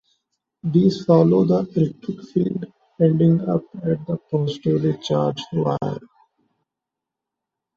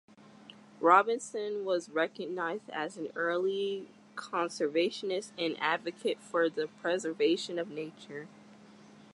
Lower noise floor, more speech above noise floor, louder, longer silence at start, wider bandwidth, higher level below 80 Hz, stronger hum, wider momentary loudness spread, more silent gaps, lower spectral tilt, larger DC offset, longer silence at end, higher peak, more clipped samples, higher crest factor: first, -85 dBFS vs -55 dBFS; first, 66 dB vs 23 dB; first, -20 LUFS vs -32 LUFS; first, 0.65 s vs 0.45 s; second, 7 kHz vs 11.5 kHz; first, -58 dBFS vs -88 dBFS; neither; about the same, 11 LU vs 13 LU; neither; first, -9 dB/octave vs -4 dB/octave; neither; first, 1.8 s vs 0.1 s; first, -2 dBFS vs -10 dBFS; neither; second, 18 dB vs 24 dB